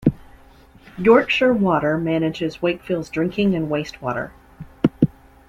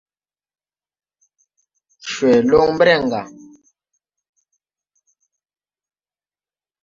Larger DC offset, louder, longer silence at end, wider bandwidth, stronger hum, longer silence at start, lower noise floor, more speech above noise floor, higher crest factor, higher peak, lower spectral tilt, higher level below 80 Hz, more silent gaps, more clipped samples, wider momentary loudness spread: neither; second, -20 LUFS vs -16 LUFS; second, 0.4 s vs 3.55 s; first, 13.5 kHz vs 7.6 kHz; second, none vs 50 Hz at -60 dBFS; second, 0 s vs 2.05 s; second, -48 dBFS vs under -90 dBFS; second, 29 dB vs over 76 dB; about the same, 18 dB vs 20 dB; about the same, -2 dBFS vs -2 dBFS; first, -7.5 dB/octave vs -5 dB/octave; first, -48 dBFS vs -54 dBFS; neither; neither; second, 11 LU vs 18 LU